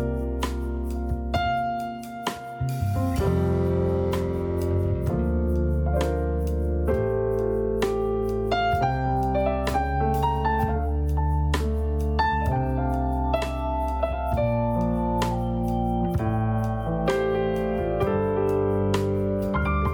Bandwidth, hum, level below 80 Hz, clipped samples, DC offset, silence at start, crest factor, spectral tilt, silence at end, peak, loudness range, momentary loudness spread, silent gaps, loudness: 18.5 kHz; none; -30 dBFS; under 0.1%; under 0.1%; 0 s; 16 dB; -7.5 dB/octave; 0 s; -8 dBFS; 1 LU; 4 LU; none; -25 LUFS